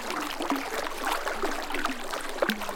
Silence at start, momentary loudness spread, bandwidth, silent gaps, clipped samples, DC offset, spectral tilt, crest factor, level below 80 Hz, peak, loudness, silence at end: 0 s; 3 LU; 17 kHz; none; under 0.1%; under 0.1%; -2.5 dB/octave; 22 dB; -44 dBFS; -8 dBFS; -31 LUFS; 0 s